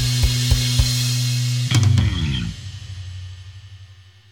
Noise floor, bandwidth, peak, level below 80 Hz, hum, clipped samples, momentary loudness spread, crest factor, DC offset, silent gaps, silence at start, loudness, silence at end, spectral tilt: -45 dBFS; 17.5 kHz; -2 dBFS; -28 dBFS; none; under 0.1%; 18 LU; 18 dB; under 0.1%; none; 0 s; -19 LUFS; 0.3 s; -4 dB/octave